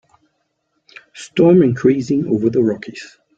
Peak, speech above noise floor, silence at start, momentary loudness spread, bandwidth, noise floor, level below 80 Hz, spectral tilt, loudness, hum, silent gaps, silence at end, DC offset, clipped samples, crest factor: -2 dBFS; 54 dB; 1.15 s; 21 LU; 8.8 kHz; -69 dBFS; -56 dBFS; -7.5 dB/octave; -15 LUFS; none; none; 0.3 s; under 0.1%; under 0.1%; 16 dB